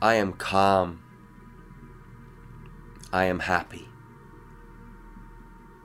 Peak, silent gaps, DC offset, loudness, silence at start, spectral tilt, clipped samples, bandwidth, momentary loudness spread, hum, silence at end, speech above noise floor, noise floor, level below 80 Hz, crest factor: -6 dBFS; none; under 0.1%; -25 LUFS; 0 s; -5.5 dB/octave; under 0.1%; 16 kHz; 27 LU; none; 0.3 s; 25 dB; -49 dBFS; -52 dBFS; 24 dB